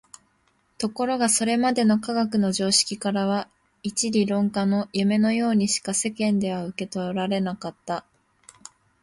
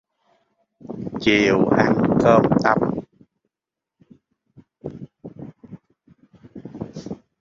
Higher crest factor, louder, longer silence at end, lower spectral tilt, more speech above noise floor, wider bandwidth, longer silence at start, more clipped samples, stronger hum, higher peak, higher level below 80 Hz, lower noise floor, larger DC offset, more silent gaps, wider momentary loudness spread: about the same, 18 dB vs 22 dB; second, -23 LUFS vs -18 LUFS; first, 1 s vs 0.25 s; second, -4 dB/octave vs -6.5 dB/octave; second, 43 dB vs 71 dB; first, 11.5 kHz vs 7.6 kHz; about the same, 0.8 s vs 0.85 s; neither; neither; second, -6 dBFS vs -2 dBFS; second, -64 dBFS vs -52 dBFS; second, -66 dBFS vs -87 dBFS; neither; neither; second, 11 LU vs 24 LU